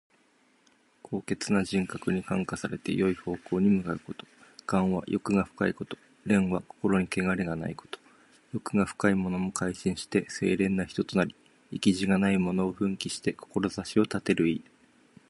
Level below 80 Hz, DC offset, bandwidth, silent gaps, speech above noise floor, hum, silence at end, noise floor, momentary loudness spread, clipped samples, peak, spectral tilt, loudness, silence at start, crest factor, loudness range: -56 dBFS; under 0.1%; 11.5 kHz; none; 37 dB; none; 0.7 s; -66 dBFS; 12 LU; under 0.1%; -10 dBFS; -6 dB/octave; -29 LUFS; 1.1 s; 20 dB; 2 LU